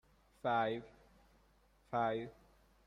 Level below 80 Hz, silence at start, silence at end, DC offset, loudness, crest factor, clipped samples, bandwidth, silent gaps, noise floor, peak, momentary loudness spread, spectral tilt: -70 dBFS; 0.45 s; 0.55 s; under 0.1%; -39 LUFS; 20 dB; under 0.1%; 12 kHz; none; -70 dBFS; -22 dBFS; 10 LU; -7 dB/octave